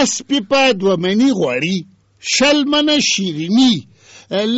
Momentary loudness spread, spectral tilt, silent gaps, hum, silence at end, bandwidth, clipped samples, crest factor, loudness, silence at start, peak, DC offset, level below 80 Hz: 8 LU; -3.5 dB/octave; none; none; 0 s; 8.2 kHz; under 0.1%; 12 dB; -15 LUFS; 0 s; -4 dBFS; under 0.1%; -54 dBFS